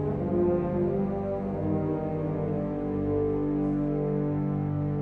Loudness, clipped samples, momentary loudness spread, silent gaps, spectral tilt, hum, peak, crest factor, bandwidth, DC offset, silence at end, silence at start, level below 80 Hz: -28 LUFS; under 0.1%; 4 LU; none; -12 dB/octave; 50 Hz at -50 dBFS; -14 dBFS; 14 dB; 3.9 kHz; under 0.1%; 0 s; 0 s; -46 dBFS